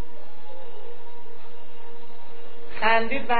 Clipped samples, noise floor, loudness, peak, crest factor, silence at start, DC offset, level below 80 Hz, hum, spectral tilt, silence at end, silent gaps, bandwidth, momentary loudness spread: under 0.1%; -48 dBFS; -23 LUFS; -4 dBFS; 24 dB; 0 s; 10%; -56 dBFS; none; -7.5 dB/octave; 0 s; none; 4.7 kHz; 26 LU